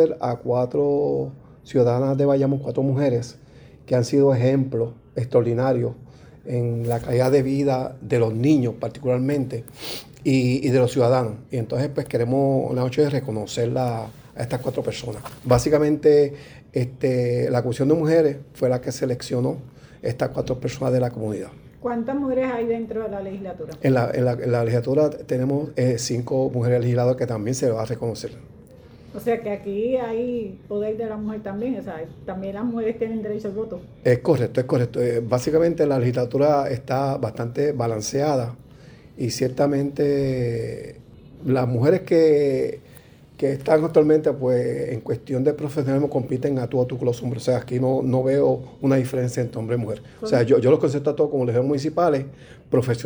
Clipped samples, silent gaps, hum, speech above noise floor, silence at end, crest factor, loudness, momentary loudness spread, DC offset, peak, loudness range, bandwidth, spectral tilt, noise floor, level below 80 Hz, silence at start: under 0.1%; none; none; 26 dB; 0 s; 18 dB; -22 LUFS; 11 LU; under 0.1%; -4 dBFS; 5 LU; over 20 kHz; -7 dB/octave; -47 dBFS; -52 dBFS; 0 s